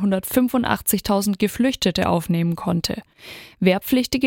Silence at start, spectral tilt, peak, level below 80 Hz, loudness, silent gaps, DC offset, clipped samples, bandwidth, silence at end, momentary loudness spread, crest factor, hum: 0 s; -5 dB/octave; -2 dBFS; -46 dBFS; -21 LUFS; none; under 0.1%; under 0.1%; 17 kHz; 0 s; 9 LU; 18 dB; none